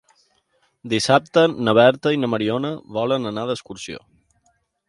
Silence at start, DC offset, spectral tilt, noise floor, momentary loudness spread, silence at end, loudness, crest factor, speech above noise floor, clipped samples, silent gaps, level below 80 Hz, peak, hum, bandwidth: 0.85 s; under 0.1%; -5 dB/octave; -66 dBFS; 17 LU; 0.9 s; -19 LUFS; 20 dB; 46 dB; under 0.1%; none; -60 dBFS; 0 dBFS; none; 11.5 kHz